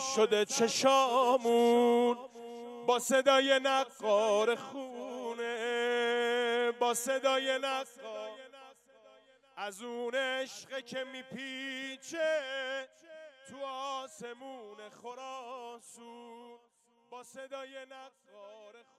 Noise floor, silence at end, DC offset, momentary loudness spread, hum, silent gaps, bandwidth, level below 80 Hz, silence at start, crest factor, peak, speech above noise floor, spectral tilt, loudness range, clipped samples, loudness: -62 dBFS; 0.2 s; under 0.1%; 24 LU; none; none; 15 kHz; -90 dBFS; 0 s; 20 dB; -12 dBFS; 30 dB; -2 dB/octave; 19 LU; under 0.1%; -31 LUFS